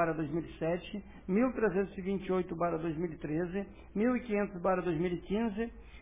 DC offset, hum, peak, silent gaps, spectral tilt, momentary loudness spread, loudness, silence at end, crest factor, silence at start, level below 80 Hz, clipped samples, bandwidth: under 0.1%; none; -18 dBFS; none; -6.5 dB/octave; 8 LU; -34 LUFS; 0 s; 16 dB; 0 s; -54 dBFS; under 0.1%; 3.8 kHz